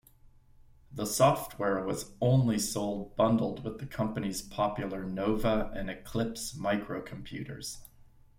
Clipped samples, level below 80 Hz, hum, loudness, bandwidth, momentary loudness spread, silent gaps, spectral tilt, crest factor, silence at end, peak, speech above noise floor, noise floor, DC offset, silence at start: under 0.1%; -50 dBFS; none; -31 LUFS; 16.5 kHz; 13 LU; none; -5.5 dB/octave; 22 dB; 0.35 s; -10 dBFS; 27 dB; -58 dBFS; under 0.1%; 0.9 s